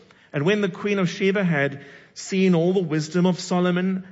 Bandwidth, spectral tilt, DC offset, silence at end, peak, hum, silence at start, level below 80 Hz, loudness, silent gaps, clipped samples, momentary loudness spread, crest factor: 8 kHz; -6 dB/octave; under 0.1%; 0 s; -8 dBFS; none; 0.35 s; -68 dBFS; -22 LUFS; none; under 0.1%; 9 LU; 14 dB